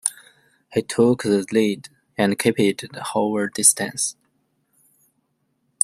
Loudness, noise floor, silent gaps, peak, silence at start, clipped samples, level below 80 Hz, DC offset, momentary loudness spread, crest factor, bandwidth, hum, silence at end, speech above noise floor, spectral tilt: -20 LUFS; -70 dBFS; none; 0 dBFS; 0.05 s; under 0.1%; -64 dBFS; under 0.1%; 11 LU; 22 dB; 16 kHz; none; 1.7 s; 50 dB; -3.5 dB/octave